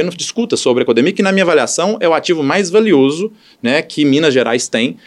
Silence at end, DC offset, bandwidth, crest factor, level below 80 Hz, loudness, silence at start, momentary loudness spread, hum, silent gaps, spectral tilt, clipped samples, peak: 0.1 s; under 0.1%; 12 kHz; 14 dB; -64 dBFS; -13 LUFS; 0 s; 6 LU; none; none; -4 dB/octave; under 0.1%; 0 dBFS